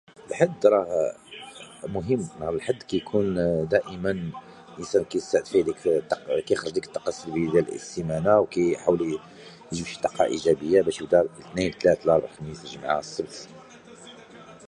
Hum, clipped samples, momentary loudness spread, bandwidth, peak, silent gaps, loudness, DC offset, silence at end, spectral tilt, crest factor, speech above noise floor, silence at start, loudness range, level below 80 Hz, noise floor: none; under 0.1%; 18 LU; 11 kHz; -4 dBFS; none; -25 LUFS; under 0.1%; 0 s; -5.5 dB/octave; 22 dB; 22 dB; 0.2 s; 3 LU; -54 dBFS; -47 dBFS